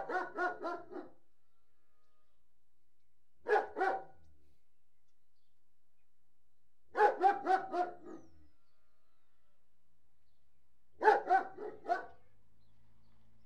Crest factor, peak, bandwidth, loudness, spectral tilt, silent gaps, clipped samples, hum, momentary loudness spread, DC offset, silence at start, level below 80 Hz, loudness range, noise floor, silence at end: 26 dB; -12 dBFS; 10 kHz; -34 LUFS; -4.5 dB/octave; none; under 0.1%; none; 18 LU; 0.3%; 0 s; -80 dBFS; 9 LU; -84 dBFS; 1.4 s